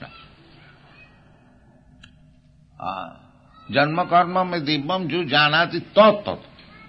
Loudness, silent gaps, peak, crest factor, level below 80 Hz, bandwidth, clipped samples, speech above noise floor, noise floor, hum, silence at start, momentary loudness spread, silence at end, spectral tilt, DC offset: -20 LUFS; none; -2 dBFS; 20 dB; -58 dBFS; 6 kHz; under 0.1%; 33 dB; -53 dBFS; none; 0 s; 18 LU; 0.45 s; -7.5 dB/octave; under 0.1%